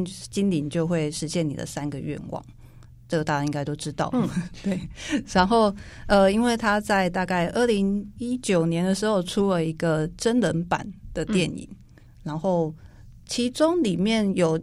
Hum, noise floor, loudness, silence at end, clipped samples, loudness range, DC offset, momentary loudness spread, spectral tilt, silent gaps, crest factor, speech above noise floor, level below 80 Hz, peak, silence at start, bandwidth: none; -47 dBFS; -24 LUFS; 0 s; under 0.1%; 6 LU; under 0.1%; 10 LU; -5.5 dB/octave; none; 18 dB; 23 dB; -46 dBFS; -6 dBFS; 0 s; 13.5 kHz